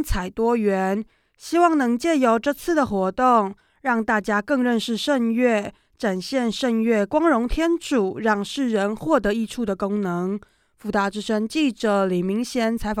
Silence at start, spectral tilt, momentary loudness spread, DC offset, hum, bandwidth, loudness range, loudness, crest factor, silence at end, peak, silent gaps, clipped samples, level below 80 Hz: 0 s; -5.5 dB/octave; 7 LU; under 0.1%; none; 16 kHz; 3 LU; -22 LUFS; 16 dB; 0 s; -4 dBFS; none; under 0.1%; -42 dBFS